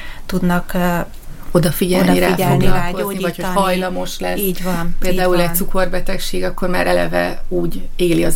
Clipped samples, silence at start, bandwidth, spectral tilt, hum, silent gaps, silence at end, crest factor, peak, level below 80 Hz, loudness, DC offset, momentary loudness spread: under 0.1%; 0 s; 17 kHz; -5.5 dB/octave; none; none; 0 s; 14 dB; 0 dBFS; -22 dBFS; -18 LUFS; under 0.1%; 8 LU